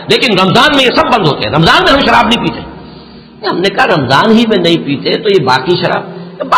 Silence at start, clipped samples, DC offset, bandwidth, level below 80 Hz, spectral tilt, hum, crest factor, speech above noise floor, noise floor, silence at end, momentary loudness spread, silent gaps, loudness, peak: 0 s; under 0.1%; under 0.1%; 16 kHz; -36 dBFS; -5 dB/octave; none; 10 dB; 24 dB; -33 dBFS; 0 s; 11 LU; none; -9 LUFS; 0 dBFS